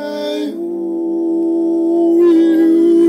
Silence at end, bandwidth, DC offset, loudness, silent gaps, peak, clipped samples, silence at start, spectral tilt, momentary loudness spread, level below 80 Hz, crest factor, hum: 0 s; 6 kHz; under 0.1%; -14 LUFS; none; -4 dBFS; under 0.1%; 0 s; -6.5 dB/octave; 10 LU; -68 dBFS; 8 dB; none